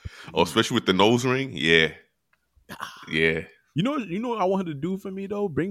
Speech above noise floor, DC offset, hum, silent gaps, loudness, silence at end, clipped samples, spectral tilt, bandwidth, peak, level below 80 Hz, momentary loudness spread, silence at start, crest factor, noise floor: 47 dB; under 0.1%; none; none; -24 LUFS; 0 s; under 0.1%; -5 dB/octave; 15 kHz; -4 dBFS; -54 dBFS; 12 LU; 0.05 s; 22 dB; -71 dBFS